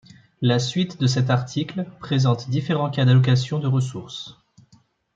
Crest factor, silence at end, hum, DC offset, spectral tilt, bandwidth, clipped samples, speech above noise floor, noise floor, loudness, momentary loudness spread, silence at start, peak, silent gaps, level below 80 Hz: 16 dB; 0.85 s; none; under 0.1%; -6.5 dB/octave; 7.6 kHz; under 0.1%; 37 dB; -58 dBFS; -21 LUFS; 13 LU; 0.4 s; -6 dBFS; none; -60 dBFS